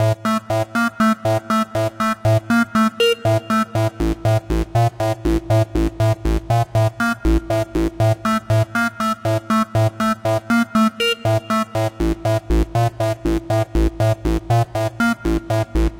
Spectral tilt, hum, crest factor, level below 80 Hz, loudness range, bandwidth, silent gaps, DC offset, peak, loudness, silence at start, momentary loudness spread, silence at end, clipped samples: -6.5 dB/octave; none; 12 dB; -28 dBFS; 2 LU; 16.5 kHz; none; under 0.1%; -6 dBFS; -19 LUFS; 0 s; 4 LU; 0 s; under 0.1%